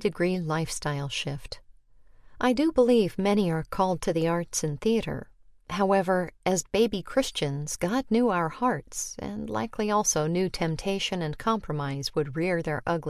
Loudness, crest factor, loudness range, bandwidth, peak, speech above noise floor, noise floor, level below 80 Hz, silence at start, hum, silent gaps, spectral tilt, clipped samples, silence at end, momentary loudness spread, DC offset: -27 LUFS; 18 dB; 2 LU; 14 kHz; -10 dBFS; 27 dB; -53 dBFS; -52 dBFS; 0 s; none; none; -4.5 dB/octave; under 0.1%; 0 s; 8 LU; under 0.1%